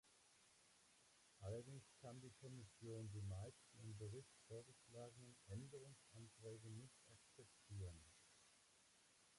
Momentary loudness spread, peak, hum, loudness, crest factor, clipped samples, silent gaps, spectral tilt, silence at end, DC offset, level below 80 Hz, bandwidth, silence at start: 11 LU; -42 dBFS; none; -59 LUFS; 18 dB; under 0.1%; none; -5.5 dB/octave; 0 s; under 0.1%; -74 dBFS; 11.5 kHz; 0.05 s